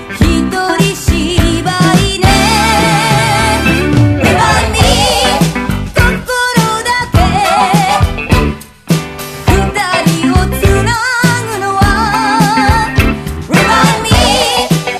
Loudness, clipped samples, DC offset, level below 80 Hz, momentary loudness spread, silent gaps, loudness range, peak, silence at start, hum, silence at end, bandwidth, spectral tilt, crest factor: -10 LUFS; 0.4%; under 0.1%; -20 dBFS; 5 LU; none; 3 LU; 0 dBFS; 0 s; none; 0 s; 14.5 kHz; -4.5 dB/octave; 10 dB